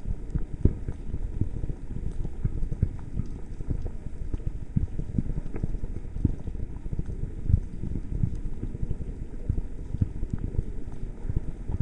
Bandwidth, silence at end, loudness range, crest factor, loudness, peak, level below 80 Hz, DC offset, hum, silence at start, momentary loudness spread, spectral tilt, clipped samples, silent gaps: 2.8 kHz; 0 s; 2 LU; 26 dB; -34 LUFS; -4 dBFS; -32 dBFS; under 0.1%; none; 0 s; 9 LU; -10 dB/octave; under 0.1%; none